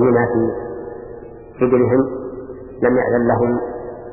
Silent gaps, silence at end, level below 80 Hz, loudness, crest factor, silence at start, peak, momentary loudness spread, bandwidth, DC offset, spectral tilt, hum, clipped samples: none; 0 s; -44 dBFS; -18 LUFS; 16 dB; 0 s; -2 dBFS; 19 LU; 2.9 kHz; under 0.1%; -13.5 dB/octave; none; under 0.1%